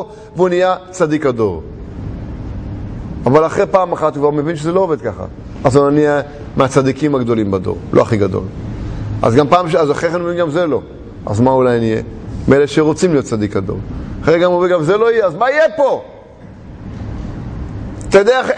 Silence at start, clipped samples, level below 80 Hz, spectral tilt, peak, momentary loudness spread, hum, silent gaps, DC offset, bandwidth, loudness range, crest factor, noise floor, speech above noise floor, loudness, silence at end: 0 s; under 0.1%; -34 dBFS; -6.5 dB/octave; 0 dBFS; 15 LU; none; none; under 0.1%; 10 kHz; 3 LU; 14 dB; -35 dBFS; 22 dB; -14 LUFS; 0 s